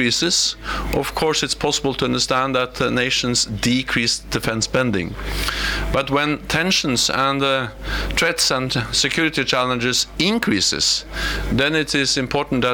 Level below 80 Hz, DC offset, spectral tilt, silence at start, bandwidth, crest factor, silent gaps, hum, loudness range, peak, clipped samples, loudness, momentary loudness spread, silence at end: -34 dBFS; under 0.1%; -3 dB/octave; 0 s; over 20 kHz; 14 dB; none; none; 2 LU; -6 dBFS; under 0.1%; -19 LUFS; 6 LU; 0 s